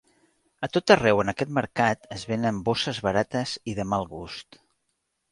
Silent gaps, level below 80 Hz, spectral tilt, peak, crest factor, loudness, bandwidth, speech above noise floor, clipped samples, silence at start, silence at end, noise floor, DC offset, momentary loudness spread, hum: none; -54 dBFS; -5 dB/octave; -4 dBFS; 22 dB; -25 LUFS; 11.5 kHz; 52 dB; under 0.1%; 0.6 s; 0.9 s; -77 dBFS; under 0.1%; 16 LU; none